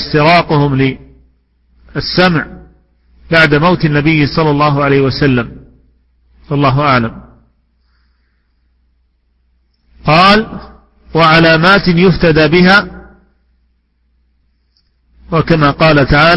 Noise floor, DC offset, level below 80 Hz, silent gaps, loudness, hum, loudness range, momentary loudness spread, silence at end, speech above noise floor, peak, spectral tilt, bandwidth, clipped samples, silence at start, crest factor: -58 dBFS; under 0.1%; -32 dBFS; none; -10 LUFS; none; 8 LU; 14 LU; 0 s; 49 dB; 0 dBFS; -7.5 dB/octave; 11 kHz; 0.2%; 0 s; 12 dB